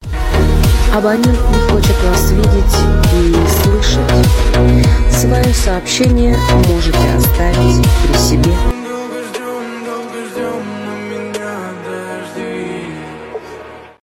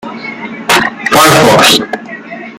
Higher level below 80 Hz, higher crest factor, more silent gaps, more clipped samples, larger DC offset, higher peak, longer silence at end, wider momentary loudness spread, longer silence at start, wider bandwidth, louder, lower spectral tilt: first, -16 dBFS vs -44 dBFS; about the same, 12 dB vs 10 dB; neither; second, under 0.1% vs 0.3%; neither; about the same, 0 dBFS vs 0 dBFS; first, 0.15 s vs 0 s; second, 13 LU vs 17 LU; about the same, 0 s vs 0.05 s; second, 16.5 kHz vs over 20 kHz; second, -13 LUFS vs -6 LUFS; first, -5.5 dB/octave vs -3 dB/octave